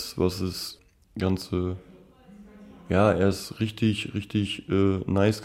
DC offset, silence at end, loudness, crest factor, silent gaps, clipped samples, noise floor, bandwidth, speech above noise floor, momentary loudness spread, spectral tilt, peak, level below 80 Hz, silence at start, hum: under 0.1%; 0 s; -26 LUFS; 18 dB; none; under 0.1%; -51 dBFS; 16 kHz; 26 dB; 11 LU; -6.5 dB/octave; -8 dBFS; -52 dBFS; 0 s; none